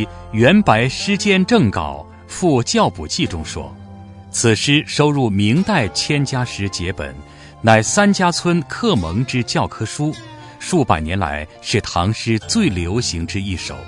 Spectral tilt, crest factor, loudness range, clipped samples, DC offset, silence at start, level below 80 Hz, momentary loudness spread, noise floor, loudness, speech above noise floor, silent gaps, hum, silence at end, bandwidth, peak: -4.5 dB/octave; 18 dB; 3 LU; under 0.1%; under 0.1%; 0 s; -42 dBFS; 14 LU; -37 dBFS; -17 LUFS; 20 dB; none; none; 0 s; 11 kHz; 0 dBFS